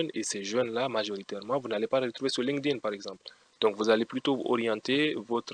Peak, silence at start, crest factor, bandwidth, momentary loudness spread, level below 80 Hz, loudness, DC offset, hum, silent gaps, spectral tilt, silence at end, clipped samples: -12 dBFS; 0 s; 18 dB; 10.5 kHz; 9 LU; -78 dBFS; -30 LUFS; under 0.1%; none; none; -4 dB/octave; 0 s; under 0.1%